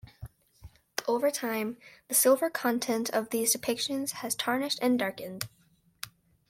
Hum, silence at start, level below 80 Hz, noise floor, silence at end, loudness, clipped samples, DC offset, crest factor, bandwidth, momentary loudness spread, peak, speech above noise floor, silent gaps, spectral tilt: none; 0.05 s; -64 dBFS; -54 dBFS; 0.4 s; -29 LUFS; under 0.1%; under 0.1%; 20 dB; 16.5 kHz; 20 LU; -10 dBFS; 25 dB; none; -2.5 dB/octave